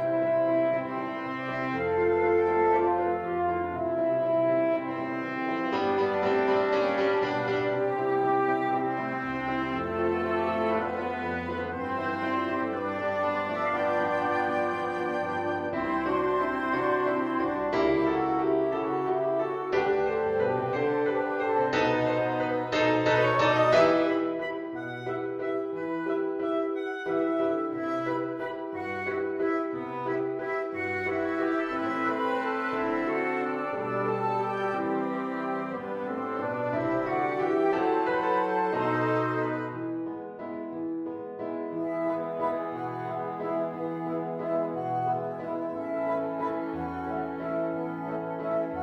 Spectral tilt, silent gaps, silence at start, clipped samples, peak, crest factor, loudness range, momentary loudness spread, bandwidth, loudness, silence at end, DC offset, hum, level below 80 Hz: -7 dB/octave; none; 0 s; under 0.1%; -10 dBFS; 18 dB; 6 LU; 8 LU; 7.8 kHz; -28 LUFS; 0 s; under 0.1%; none; -62 dBFS